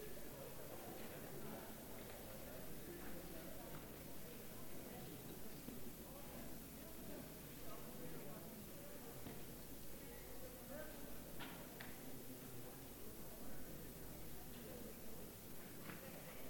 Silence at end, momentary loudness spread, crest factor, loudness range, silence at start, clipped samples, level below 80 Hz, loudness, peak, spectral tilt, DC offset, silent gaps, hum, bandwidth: 0 s; 2 LU; 16 dB; 1 LU; 0 s; under 0.1%; -66 dBFS; -54 LUFS; -36 dBFS; -4 dB/octave; under 0.1%; none; none; 17.5 kHz